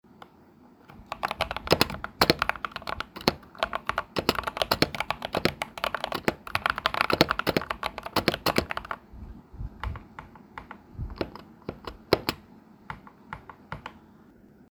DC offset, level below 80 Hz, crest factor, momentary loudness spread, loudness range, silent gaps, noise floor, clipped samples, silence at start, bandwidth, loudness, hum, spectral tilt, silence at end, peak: under 0.1%; -48 dBFS; 30 dB; 20 LU; 8 LU; none; -55 dBFS; under 0.1%; 0.2 s; over 20 kHz; -28 LUFS; none; -4 dB/octave; 0.75 s; 0 dBFS